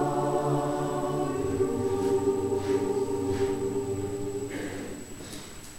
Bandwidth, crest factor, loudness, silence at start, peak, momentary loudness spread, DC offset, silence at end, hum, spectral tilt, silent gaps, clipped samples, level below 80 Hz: 16.5 kHz; 14 dB; -29 LUFS; 0 s; -14 dBFS; 12 LU; under 0.1%; 0 s; none; -6 dB/octave; none; under 0.1%; -52 dBFS